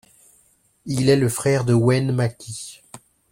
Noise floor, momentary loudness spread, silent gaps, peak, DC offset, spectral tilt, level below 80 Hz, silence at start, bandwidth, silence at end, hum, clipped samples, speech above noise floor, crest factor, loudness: -60 dBFS; 16 LU; none; -4 dBFS; under 0.1%; -6 dB/octave; -54 dBFS; 0.85 s; 16.5 kHz; 0.35 s; none; under 0.1%; 41 dB; 18 dB; -20 LUFS